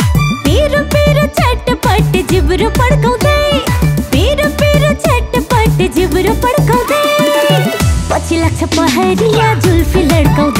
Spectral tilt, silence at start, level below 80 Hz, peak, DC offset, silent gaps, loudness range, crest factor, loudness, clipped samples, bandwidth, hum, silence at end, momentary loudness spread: -5.5 dB/octave; 0 s; -20 dBFS; 0 dBFS; under 0.1%; none; 0 LU; 10 dB; -11 LUFS; under 0.1%; 16.5 kHz; none; 0 s; 3 LU